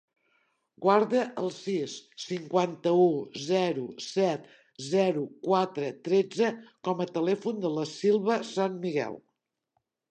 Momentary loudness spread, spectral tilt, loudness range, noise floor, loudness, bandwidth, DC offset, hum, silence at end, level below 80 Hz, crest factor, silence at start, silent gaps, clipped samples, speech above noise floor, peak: 11 LU; -5.5 dB/octave; 2 LU; -80 dBFS; -28 LUFS; 9.2 kHz; under 0.1%; none; 0.9 s; -80 dBFS; 20 dB; 0.8 s; none; under 0.1%; 52 dB; -8 dBFS